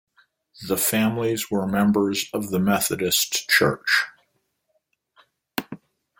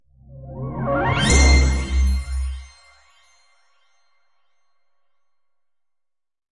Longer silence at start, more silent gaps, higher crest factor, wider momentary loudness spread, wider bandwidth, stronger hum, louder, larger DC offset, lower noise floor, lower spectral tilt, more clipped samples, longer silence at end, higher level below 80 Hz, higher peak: first, 0.6 s vs 0.3 s; neither; about the same, 20 dB vs 18 dB; second, 14 LU vs 21 LU; first, 17 kHz vs 11.5 kHz; neither; second, -22 LUFS vs -19 LUFS; neither; second, -72 dBFS vs -79 dBFS; about the same, -3.5 dB/octave vs -4.5 dB/octave; neither; second, 0.45 s vs 3.85 s; second, -60 dBFS vs -24 dBFS; about the same, -4 dBFS vs -4 dBFS